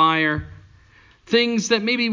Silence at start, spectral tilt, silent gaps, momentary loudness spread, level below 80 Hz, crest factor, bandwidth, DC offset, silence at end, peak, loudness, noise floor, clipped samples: 0 s; -4 dB/octave; none; 9 LU; -46 dBFS; 18 dB; 7.6 kHz; under 0.1%; 0 s; -4 dBFS; -20 LUFS; -52 dBFS; under 0.1%